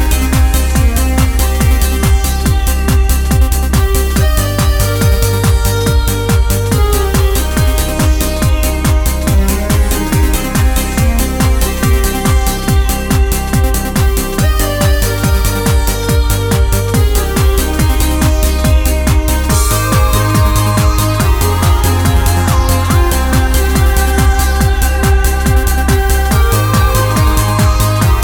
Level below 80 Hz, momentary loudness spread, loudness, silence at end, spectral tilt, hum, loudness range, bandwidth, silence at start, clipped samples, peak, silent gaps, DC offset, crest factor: -12 dBFS; 2 LU; -12 LUFS; 0 s; -5 dB/octave; none; 1 LU; over 20 kHz; 0 s; under 0.1%; 0 dBFS; none; under 0.1%; 10 dB